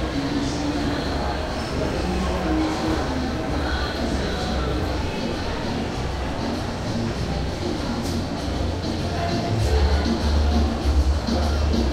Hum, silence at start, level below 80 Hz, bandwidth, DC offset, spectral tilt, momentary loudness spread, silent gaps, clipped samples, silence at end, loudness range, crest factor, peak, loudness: none; 0 s; -28 dBFS; 13.5 kHz; under 0.1%; -6 dB/octave; 5 LU; none; under 0.1%; 0 s; 4 LU; 14 dB; -8 dBFS; -24 LUFS